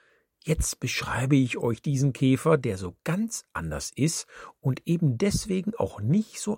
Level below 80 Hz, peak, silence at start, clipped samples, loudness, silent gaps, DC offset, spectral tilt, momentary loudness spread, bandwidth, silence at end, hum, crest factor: -44 dBFS; -8 dBFS; 0.45 s; under 0.1%; -27 LUFS; none; under 0.1%; -5.5 dB/octave; 10 LU; 16.5 kHz; 0 s; none; 18 dB